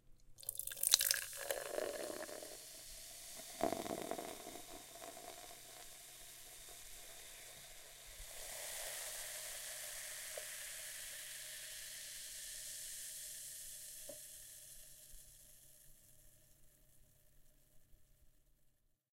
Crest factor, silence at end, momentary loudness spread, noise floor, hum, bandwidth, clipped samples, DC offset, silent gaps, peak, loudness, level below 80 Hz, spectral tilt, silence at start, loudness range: 40 dB; 0.45 s; 13 LU; -75 dBFS; none; 16.5 kHz; under 0.1%; under 0.1%; none; -8 dBFS; -44 LUFS; -68 dBFS; 0 dB/octave; 0.05 s; 17 LU